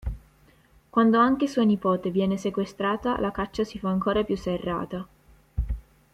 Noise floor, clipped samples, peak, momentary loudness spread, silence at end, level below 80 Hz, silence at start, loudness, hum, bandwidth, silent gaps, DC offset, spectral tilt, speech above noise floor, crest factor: -58 dBFS; under 0.1%; -8 dBFS; 16 LU; 0.35 s; -40 dBFS; 0.05 s; -25 LUFS; none; 11.5 kHz; none; under 0.1%; -7 dB/octave; 34 dB; 18 dB